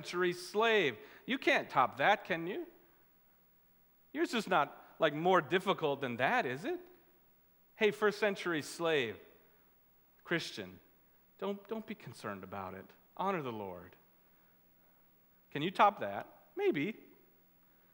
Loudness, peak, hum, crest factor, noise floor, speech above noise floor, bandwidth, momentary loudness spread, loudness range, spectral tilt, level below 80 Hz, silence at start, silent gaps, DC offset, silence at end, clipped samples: -34 LUFS; -12 dBFS; none; 24 dB; -67 dBFS; 33 dB; 20 kHz; 17 LU; 10 LU; -5 dB/octave; -82 dBFS; 0 s; none; under 0.1%; 0.95 s; under 0.1%